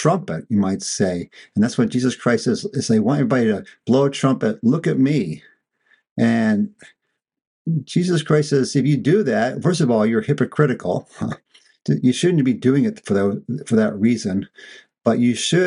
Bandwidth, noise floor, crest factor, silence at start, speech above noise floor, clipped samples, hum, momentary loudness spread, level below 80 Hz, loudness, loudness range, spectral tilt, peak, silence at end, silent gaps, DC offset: 11 kHz; -62 dBFS; 16 dB; 0 s; 43 dB; under 0.1%; none; 10 LU; -60 dBFS; -19 LUFS; 3 LU; -6 dB/octave; -2 dBFS; 0 s; 6.11-6.16 s, 7.47-7.65 s; under 0.1%